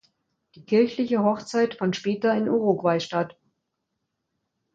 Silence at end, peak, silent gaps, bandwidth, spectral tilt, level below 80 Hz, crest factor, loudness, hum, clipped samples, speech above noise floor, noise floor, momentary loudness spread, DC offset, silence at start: 1.45 s; -8 dBFS; none; 7.8 kHz; -6 dB/octave; -70 dBFS; 18 dB; -24 LUFS; none; under 0.1%; 56 dB; -80 dBFS; 5 LU; under 0.1%; 0.55 s